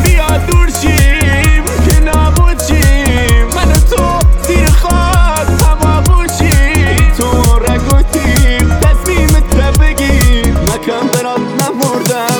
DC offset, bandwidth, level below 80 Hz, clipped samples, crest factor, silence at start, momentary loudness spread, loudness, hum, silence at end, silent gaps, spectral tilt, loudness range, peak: under 0.1%; over 20 kHz; -10 dBFS; 0.7%; 8 dB; 0 s; 3 LU; -10 LUFS; none; 0 s; none; -5 dB/octave; 1 LU; 0 dBFS